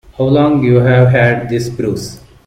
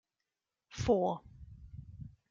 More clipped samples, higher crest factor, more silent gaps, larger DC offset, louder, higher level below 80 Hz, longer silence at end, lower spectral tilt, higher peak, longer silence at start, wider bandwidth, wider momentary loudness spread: neither; second, 12 dB vs 22 dB; neither; neither; first, -12 LUFS vs -34 LUFS; first, -40 dBFS vs -56 dBFS; about the same, 0.3 s vs 0.25 s; about the same, -7.5 dB/octave vs -6.5 dB/octave; first, 0 dBFS vs -16 dBFS; second, 0.2 s vs 0.7 s; first, 10.5 kHz vs 7.6 kHz; second, 10 LU vs 23 LU